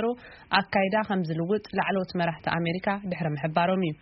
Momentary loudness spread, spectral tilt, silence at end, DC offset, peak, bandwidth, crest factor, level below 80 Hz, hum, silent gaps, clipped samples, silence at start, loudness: 5 LU; -4.5 dB/octave; 0.1 s; under 0.1%; -4 dBFS; 5.8 kHz; 22 dB; -60 dBFS; none; none; under 0.1%; 0 s; -27 LUFS